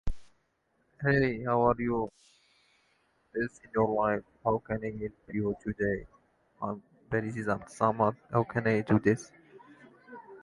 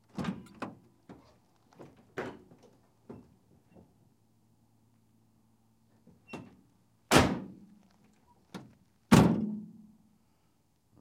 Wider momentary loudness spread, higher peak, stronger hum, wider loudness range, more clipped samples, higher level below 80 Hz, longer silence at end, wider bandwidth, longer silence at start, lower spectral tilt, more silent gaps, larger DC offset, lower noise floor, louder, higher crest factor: second, 13 LU vs 29 LU; second, -10 dBFS vs -4 dBFS; neither; second, 4 LU vs 20 LU; neither; about the same, -52 dBFS vs -56 dBFS; second, 0.05 s vs 1.35 s; second, 11.5 kHz vs 16 kHz; about the same, 0.05 s vs 0.15 s; first, -7.5 dB/octave vs -5.5 dB/octave; neither; neither; about the same, -74 dBFS vs -72 dBFS; about the same, -31 LUFS vs -29 LUFS; second, 22 dB vs 32 dB